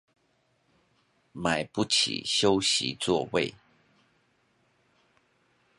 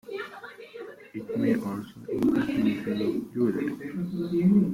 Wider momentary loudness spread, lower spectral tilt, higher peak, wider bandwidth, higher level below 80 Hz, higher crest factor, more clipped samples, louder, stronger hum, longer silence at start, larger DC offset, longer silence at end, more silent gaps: second, 8 LU vs 17 LU; second, -3 dB/octave vs -8 dB/octave; first, -8 dBFS vs -12 dBFS; second, 11.5 kHz vs 15.5 kHz; about the same, -62 dBFS vs -60 dBFS; first, 22 dB vs 16 dB; neither; about the same, -26 LUFS vs -28 LUFS; neither; first, 1.35 s vs 0.05 s; neither; first, 2.25 s vs 0 s; neither